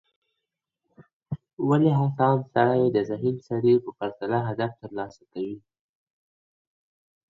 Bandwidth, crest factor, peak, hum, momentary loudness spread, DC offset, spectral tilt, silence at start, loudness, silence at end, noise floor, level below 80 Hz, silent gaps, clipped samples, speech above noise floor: 7.6 kHz; 20 dB; -6 dBFS; none; 15 LU; under 0.1%; -9.5 dB/octave; 1.3 s; -25 LUFS; 1.7 s; -84 dBFS; -66 dBFS; 1.53-1.57 s; under 0.1%; 60 dB